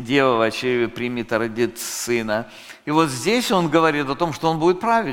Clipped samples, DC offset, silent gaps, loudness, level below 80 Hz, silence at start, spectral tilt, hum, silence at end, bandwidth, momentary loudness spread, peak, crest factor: under 0.1%; under 0.1%; none; -20 LUFS; -50 dBFS; 0 s; -4.5 dB/octave; none; 0 s; 17 kHz; 8 LU; -2 dBFS; 18 dB